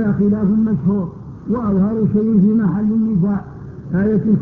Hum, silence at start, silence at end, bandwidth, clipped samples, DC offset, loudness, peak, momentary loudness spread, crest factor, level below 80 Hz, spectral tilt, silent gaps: none; 0 s; 0 s; 2.2 kHz; under 0.1%; under 0.1%; -17 LUFS; -4 dBFS; 10 LU; 12 dB; -40 dBFS; -12.5 dB/octave; none